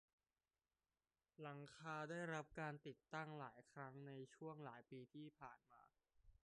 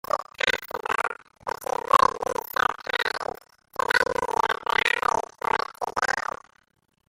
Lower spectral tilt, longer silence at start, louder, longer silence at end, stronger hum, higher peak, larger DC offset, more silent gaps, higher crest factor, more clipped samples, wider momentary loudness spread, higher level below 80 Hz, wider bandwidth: first, -6 dB/octave vs -1.5 dB/octave; first, 1.4 s vs 0.15 s; second, -55 LUFS vs -25 LUFS; second, 0.15 s vs 0.9 s; neither; second, -36 dBFS vs -4 dBFS; neither; neither; about the same, 20 dB vs 22 dB; neither; about the same, 11 LU vs 12 LU; second, -84 dBFS vs -56 dBFS; second, 10 kHz vs 16.5 kHz